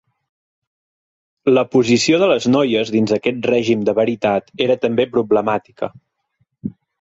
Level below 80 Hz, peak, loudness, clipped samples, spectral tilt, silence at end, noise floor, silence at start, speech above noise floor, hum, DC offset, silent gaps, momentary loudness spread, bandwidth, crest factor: -56 dBFS; -2 dBFS; -16 LUFS; under 0.1%; -5 dB/octave; 0.3 s; -67 dBFS; 1.45 s; 51 dB; none; under 0.1%; none; 14 LU; 8 kHz; 14 dB